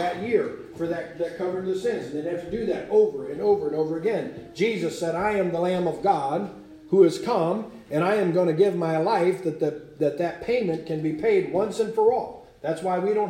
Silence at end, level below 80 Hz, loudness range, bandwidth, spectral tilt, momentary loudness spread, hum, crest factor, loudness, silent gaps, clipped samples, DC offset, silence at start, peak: 0 s; -60 dBFS; 3 LU; 13.5 kHz; -6.5 dB/octave; 9 LU; none; 18 dB; -25 LUFS; none; under 0.1%; under 0.1%; 0 s; -6 dBFS